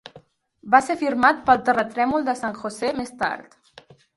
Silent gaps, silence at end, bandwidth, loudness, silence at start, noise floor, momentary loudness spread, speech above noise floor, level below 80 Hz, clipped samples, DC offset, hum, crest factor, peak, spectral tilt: none; 0.75 s; 11.5 kHz; -21 LUFS; 0.15 s; -52 dBFS; 9 LU; 31 dB; -58 dBFS; under 0.1%; under 0.1%; none; 22 dB; 0 dBFS; -4.5 dB/octave